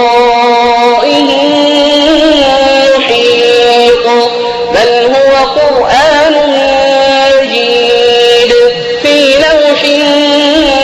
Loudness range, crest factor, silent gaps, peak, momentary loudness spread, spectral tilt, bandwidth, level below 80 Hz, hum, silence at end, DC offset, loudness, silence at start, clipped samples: 1 LU; 6 dB; none; 0 dBFS; 3 LU; -3 dB/octave; 12.5 kHz; -36 dBFS; none; 0 s; under 0.1%; -6 LUFS; 0 s; 0.1%